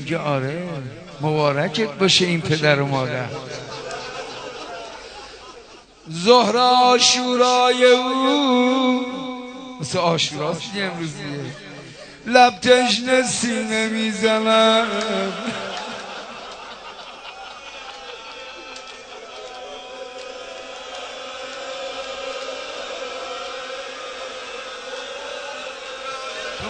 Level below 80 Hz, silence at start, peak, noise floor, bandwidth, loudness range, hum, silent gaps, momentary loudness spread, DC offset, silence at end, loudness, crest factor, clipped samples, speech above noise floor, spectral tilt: -58 dBFS; 0 s; 0 dBFS; -44 dBFS; 9.4 kHz; 18 LU; none; none; 20 LU; under 0.1%; 0 s; -20 LUFS; 22 dB; under 0.1%; 26 dB; -3.5 dB/octave